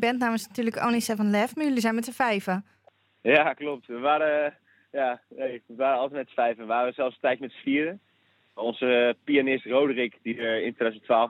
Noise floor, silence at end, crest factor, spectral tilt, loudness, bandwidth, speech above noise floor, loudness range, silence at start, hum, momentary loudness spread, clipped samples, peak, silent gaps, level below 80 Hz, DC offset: -66 dBFS; 0 s; 20 dB; -4.5 dB/octave; -26 LUFS; 16.5 kHz; 40 dB; 3 LU; 0 s; none; 10 LU; under 0.1%; -6 dBFS; none; -78 dBFS; under 0.1%